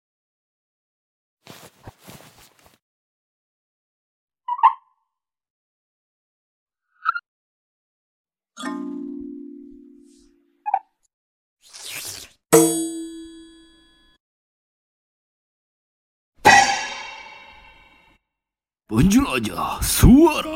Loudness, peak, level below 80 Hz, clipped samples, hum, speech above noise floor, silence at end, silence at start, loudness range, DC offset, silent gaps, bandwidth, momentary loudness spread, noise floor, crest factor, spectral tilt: -18 LUFS; 0 dBFS; -36 dBFS; under 0.1%; none; 73 dB; 0 s; 1.85 s; 14 LU; under 0.1%; 2.82-4.28 s, 5.50-6.66 s, 7.28-8.24 s, 11.14-11.57 s, 14.20-16.32 s; 17 kHz; 25 LU; -89 dBFS; 24 dB; -4.5 dB/octave